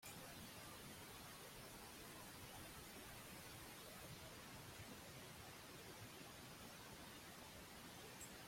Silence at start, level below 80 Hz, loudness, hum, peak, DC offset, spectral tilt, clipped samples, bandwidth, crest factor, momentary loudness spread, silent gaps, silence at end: 0 s; -72 dBFS; -56 LUFS; none; -42 dBFS; under 0.1%; -3 dB/octave; under 0.1%; 16.5 kHz; 16 dB; 1 LU; none; 0 s